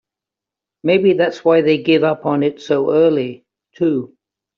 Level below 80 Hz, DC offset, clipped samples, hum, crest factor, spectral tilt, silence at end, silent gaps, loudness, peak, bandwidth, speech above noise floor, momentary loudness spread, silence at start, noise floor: -62 dBFS; under 0.1%; under 0.1%; none; 14 dB; -5 dB/octave; 0.5 s; none; -16 LUFS; -2 dBFS; 7 kHz; 71 dB; 9 LU; 0.85 s; -86 dBFS